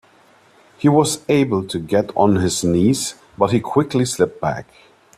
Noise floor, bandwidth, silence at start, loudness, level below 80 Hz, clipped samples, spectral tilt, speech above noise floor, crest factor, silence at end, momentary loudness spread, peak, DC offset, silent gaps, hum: -52 dBFS; 14.5 kHz; 0.8 s; -18 LUFS; -52 dBFS; under 0.1%; -5.5 dB/octave; 34 dB; 18 dB; 0.55 s; 7 LU; 0 dBFS; under 0.1%; none; none